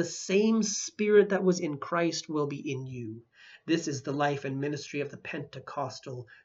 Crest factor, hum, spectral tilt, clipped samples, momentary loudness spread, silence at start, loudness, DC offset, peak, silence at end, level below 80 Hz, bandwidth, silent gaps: 20 dB; none; -4.5 dB/octave; under 0.1%; 16 LU; 0 s; -30 LUFS; under 0.1%; -10 dBFS; 0.1 s; -76 dBFS; 8 kHz; none